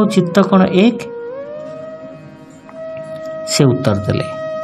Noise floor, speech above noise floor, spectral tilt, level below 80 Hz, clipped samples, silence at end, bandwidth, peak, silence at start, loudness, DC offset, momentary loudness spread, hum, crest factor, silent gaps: -37 dBFS; 24 dB; -6 dB/octave; -52 dBFS; under 0.1%; 0 s; 13 kHz; 0 dBFS; 0 s; -15 LUFS; under 0.1%; 20 LU; none; 16 dB; none